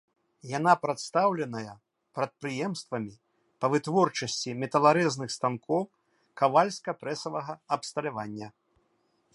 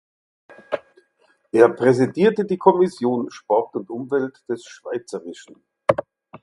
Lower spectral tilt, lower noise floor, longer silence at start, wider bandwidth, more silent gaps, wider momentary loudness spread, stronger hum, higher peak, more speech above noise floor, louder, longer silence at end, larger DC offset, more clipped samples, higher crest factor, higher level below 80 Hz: second, -5 dB/octave vs -7 dB/octave; first, -72 dBFS vs -62 dBFS; second, 0.45 s vs 0.7 s; about the same, 11.5 kHz vs 11.5 kHz; neither; about the same, 14 LU vs 14 LU; neither; second, -8 dBFS vs 0 dBFS; about the same, 44 dB vs 43 dB; second, -28 LUFS vs -21 LUFS; first, 0.85 s vs 0.05 s; neither; neither; about the same, 22 dB vs 20 dB; second, -74 dBFS vs -64 dBFS